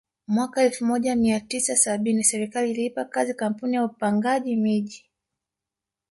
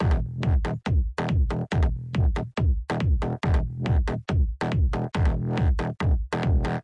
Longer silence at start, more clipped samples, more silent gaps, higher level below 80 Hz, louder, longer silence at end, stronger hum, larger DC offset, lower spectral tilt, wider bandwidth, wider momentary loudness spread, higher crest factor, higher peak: first, 0.3 s vs 0 s; neither; neither; second, -62 dBFS vs -28 dBFS; first, -23 LUFS vs -26 LUFS; first, 1.15 s vs 0 s; neither; neither; second, -4 dB/octave vs -8 dB/octave; first, 11.5 kHz vs 8.6 kHz; first, 7 LU vs 1 LU; first, 18 dB vs 10 dB; first, -6 dBFS vs -12 dBFS